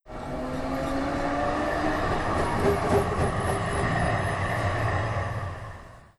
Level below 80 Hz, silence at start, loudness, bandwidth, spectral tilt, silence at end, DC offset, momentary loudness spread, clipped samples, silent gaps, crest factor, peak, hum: -38 dBFS; 0.05 s; -27 LUFS; 13 kHz; -6 dB/octave; 0.15 s; under 0.1%; 9 LU; under 0.1%; none; 14 dB; -12 dBFS; none